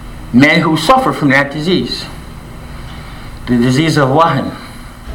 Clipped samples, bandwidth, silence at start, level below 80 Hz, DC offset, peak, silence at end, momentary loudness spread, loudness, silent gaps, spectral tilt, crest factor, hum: under 0.1%; 17.5 kHz; 0 s; -32 dBFS; under 0.1%; 0 dBFS; 0 s; 21 LU; -11 LUFS; none; -5.5 dB/octave; 14 dB; none